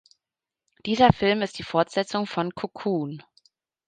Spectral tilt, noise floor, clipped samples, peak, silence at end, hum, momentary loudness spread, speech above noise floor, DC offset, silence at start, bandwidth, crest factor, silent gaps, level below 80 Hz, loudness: -6 dB/octave; -89 dBFS; under 0.1%; -2 dBFS; 0.65 s; none; 13 LU; 65 dB; under 0.1%; 0.85 s; 9.4 kHz; 24 dB; none; -52 dBFS; -24 LUFS